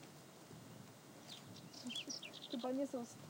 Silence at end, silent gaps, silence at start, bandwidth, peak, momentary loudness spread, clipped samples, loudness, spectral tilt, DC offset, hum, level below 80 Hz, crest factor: 0 s; none; 0 s; 17 kHz; -30 dBFS; 15 LU; under 0.1%; -47 LUFS; -3.5 dB/octave; under 0.1%; none; -88 dBFS; 18 dB